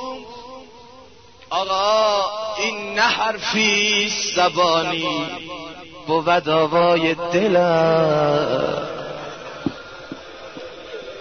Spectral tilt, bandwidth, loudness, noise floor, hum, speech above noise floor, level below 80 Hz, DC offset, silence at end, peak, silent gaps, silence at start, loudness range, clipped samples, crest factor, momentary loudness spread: -3.5 dB/octave; 6.6 kHz; -19 LUFS; -46 dBFS; none; 28 dB; -56 dBFS; 0.2%; 0 s; -4 dBFS; none; 0 s; 4 LU; under 0.1%; 16 dB; 19 LU